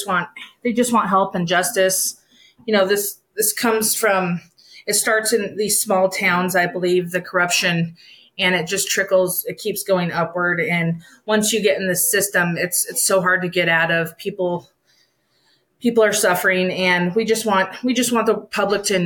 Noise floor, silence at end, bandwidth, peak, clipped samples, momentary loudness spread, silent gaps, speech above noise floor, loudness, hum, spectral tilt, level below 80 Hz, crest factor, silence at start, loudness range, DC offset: -62 dBFS; 0 s; 19.5 kHz; -6 dBFS; under 0.1%; 8 LU; none; 43 dB; -18 LUFS; none; -3 dB/octave; -64 dBFS; 14 dB; 0 s; 2 LU; under 0.1%